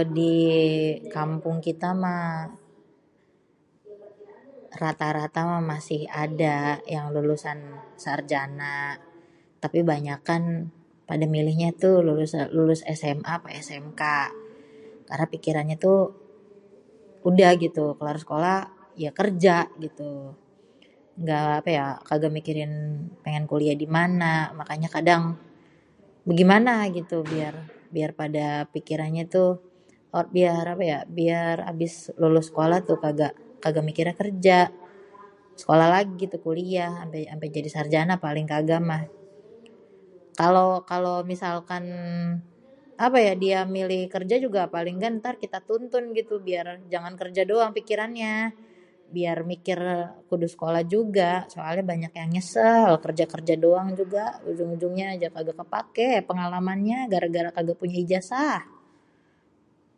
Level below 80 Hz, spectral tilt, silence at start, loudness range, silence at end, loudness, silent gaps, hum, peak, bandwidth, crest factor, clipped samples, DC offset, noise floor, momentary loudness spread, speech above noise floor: -70 dBFS; -6.5 dB/octave; 0 s; 5 LU; 1.35 s; -25 LUFS; none; none; -2 dBFS; 11 kHz; 22 dB; under 0.1%; under 0.1%; -64 dBFS; 12 LU; 40 dB